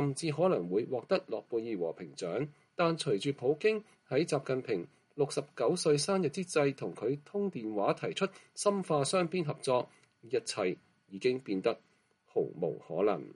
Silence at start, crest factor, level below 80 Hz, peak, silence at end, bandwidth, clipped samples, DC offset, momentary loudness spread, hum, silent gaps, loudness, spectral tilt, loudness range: 0 s; 18 dB; -78 dBFS; -16 dBFS; 0.05 s; 11.5 kHz; under 0.1%; under 0.1%; 8 LU; none; none; -33 LUFS; -5 dB/octave; 2 LU